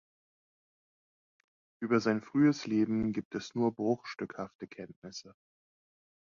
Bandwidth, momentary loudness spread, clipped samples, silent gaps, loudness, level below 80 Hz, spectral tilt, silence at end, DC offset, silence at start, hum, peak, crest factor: 7.4 kHz; 18 LU; under 0.1%; 3.25-3.31 s, 4.55-4.59 s, 4.96-5.02 s; -32 LUFS; -68 dBFS; -6.5 dB/octave; 0.9 s; under 0.1%; 1.8 s; none; -14 dBFS; 20 dB